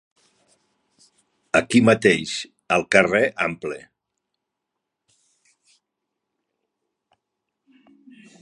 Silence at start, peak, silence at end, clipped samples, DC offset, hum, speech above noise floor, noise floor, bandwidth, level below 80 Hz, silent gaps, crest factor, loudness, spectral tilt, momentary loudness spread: 1.55 s; 0 dBFS; 4.65 s; under 0.1%; under 0.1%; none; 63 dB; -82 dBFS; 11.5 kHz; -60 dBFS; none; 24 dB; -19 LUFS; -4.5 dB/octave; 15 LU